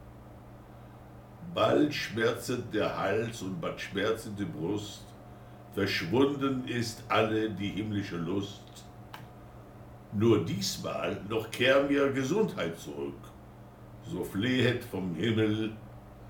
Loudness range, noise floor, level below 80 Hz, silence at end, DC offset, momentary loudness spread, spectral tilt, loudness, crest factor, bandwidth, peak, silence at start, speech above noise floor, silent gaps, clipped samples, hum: 5 LU; -50 dBFS; -58 dBFS; 0 s; under 0.1%; 24 LU; -5.5 dB/octave; -30 LUFS; 20 dB; 19 kHz; -12 dBFS; 0 s; 20 dB; none; under 0.1%; none